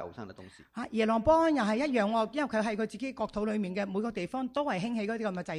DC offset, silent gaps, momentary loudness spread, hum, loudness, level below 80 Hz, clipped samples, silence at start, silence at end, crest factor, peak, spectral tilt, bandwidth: under 0.1%; none; 11 LU; none; -30 LUFS; -58 dBFS; under 0.1%; 0 s; 0 s; 16 dB; -14 dBFS; -6 dB/octave; 11 kHz